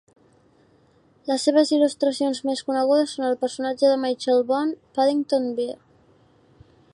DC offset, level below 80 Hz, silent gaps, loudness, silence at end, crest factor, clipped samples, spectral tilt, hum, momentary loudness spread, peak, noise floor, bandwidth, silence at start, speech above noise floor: under 0.1%; -70 dBFS; none; -22 LUFS; 1.2 s; 16 dB; under 0.1%; -3.5 dB/octave; none; 8 LU; -6 dBFS; -58 dBFS; 11.5 kHz; 1.25 s; 37 dB